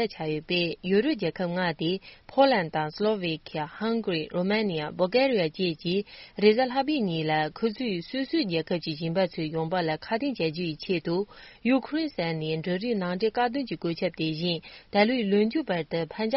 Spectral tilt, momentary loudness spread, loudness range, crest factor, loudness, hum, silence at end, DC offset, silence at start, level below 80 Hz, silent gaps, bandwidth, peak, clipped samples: -4 dB/octave; 8 LU; 3 LU; 20 dB; -27 LUFS; none; 0 s; under 0.1%; 0 s; -60 dBFS; none; 5.8 kHz; -8 dBFS; under 0.1%